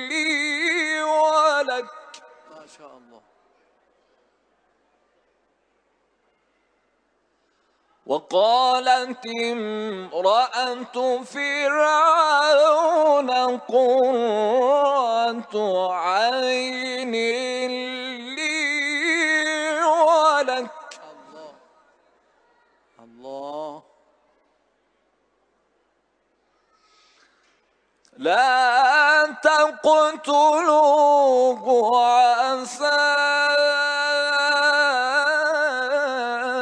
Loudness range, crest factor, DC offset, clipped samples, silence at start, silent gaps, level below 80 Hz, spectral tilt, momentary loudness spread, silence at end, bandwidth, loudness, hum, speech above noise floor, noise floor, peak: 20 LU; 16 dB; under 0.1%; under 0.1%; 0 s; none; -80 dBFS; -1.5 dB/octave; 11 LU; 0 s; 10 kHz; -19 LUFS; none; 49 dB; -68 dBFS; -4 dBFS